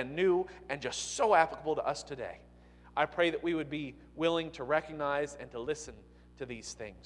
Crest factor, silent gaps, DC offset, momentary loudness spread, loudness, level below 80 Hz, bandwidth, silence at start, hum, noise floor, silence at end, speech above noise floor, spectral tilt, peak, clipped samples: 22 dB; none; under 0.1%; 16 LU; -33 LUFS; -60 dBFS; 11.5 kHz; 0 s; 60 Hz at -60 dBFS; -56 dBFS; 0.05 s; 23 dB; -4 dB/octave; -12 dBFS; under 0.1%